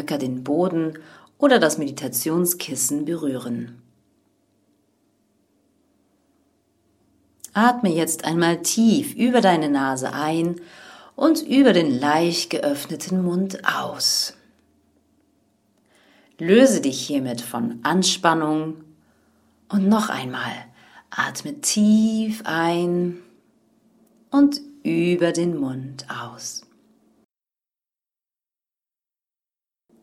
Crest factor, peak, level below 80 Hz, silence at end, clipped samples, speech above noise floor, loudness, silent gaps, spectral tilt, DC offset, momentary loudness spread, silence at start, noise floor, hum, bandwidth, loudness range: 22 dB; 0 dBFS; -68 dBFS; 3.45 s; under 0.1%; over 70 dB; -21 LUFS; none; -4 dB/octave; under 0.1%; 14 LU; 0 s; under -90 dBFS; none; 16.5 kHz; 8 LU